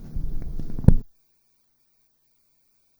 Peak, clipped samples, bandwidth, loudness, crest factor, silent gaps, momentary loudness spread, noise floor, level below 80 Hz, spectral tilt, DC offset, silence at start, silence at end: 0 dBFS; under 0.1%; over 20 kHz; -25 LUFS; 24 dB; none; 16 LU; -66 dBFS; -28 dBFS; -10.5 dB/octave; under 0.1%; 0 s; 1.95 s